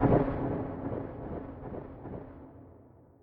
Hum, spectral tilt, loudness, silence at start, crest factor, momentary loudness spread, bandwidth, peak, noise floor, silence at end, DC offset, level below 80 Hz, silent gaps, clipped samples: none; -12 dB/octave; -35 LUFS; 0 s; 22 dB; 22 LU; 4.5 kHz; -12 dBFS; -56 dBFS; 0.35 s; under 0.1%; -46 dBFS; none; under 0.1%